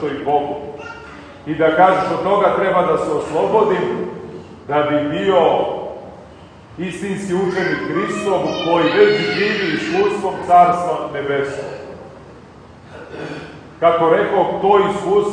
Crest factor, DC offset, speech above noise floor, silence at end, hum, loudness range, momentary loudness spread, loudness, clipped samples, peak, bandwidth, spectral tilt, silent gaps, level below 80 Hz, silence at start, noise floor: 18 dB; under 0.1%; 24 dB; 0 s; none; 5 LU; 19 LU; -16 LUFS; under 0.1%; 0 dBFS; 10 kHz; -6 dB/octave; none; -52 dBFS; 0 s; -40 dBFS